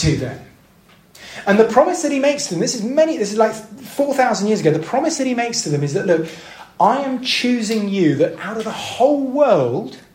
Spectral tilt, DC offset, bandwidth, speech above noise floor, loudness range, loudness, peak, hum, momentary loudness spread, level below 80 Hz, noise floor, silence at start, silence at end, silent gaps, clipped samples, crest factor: -4.5 dB/octave; under 0.1%; 16 kHz; 33 dB; 2 LU; -17 LUFS; 0 dBFS; none; 10 LU; -48 dBFS; -50 dBFS; 0 s; 0.15 s; none; under 0.1%; 16 dB